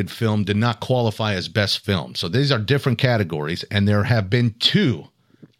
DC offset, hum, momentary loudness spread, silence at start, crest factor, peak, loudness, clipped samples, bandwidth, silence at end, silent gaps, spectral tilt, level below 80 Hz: under 0.1%; none; 6 LU; 0 s; 18 dB; -2 dBFS; -20 LUFS; under 0.1%; 15 kHz; 0.55 s; none; -6 dB/octave; -56 dBFS